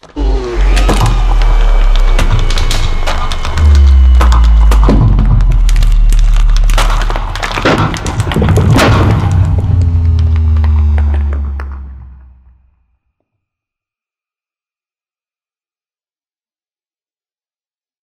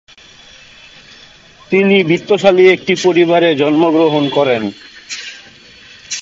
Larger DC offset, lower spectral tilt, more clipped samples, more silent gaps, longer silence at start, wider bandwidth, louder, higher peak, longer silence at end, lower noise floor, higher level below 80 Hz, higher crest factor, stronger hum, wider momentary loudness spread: neither; about the same, -6 dB/octave vs -5 dB/octave; neither; neither; second, 0.15 s vs 1.7 s; first, 13 kHz vs 7.8 kHz; about the same, -11 LUFS vs -11 LUFS; about the same, 0 dBFS vs 0 dBFS; first, 5.9 s vs 0 s; first, under -90 dBFS vs -42 dBFS; first, -10 dBFS vs -56 dBFS; about the same, 10 dB vs 14 dB; neither; second, 9 LU vs 16 LU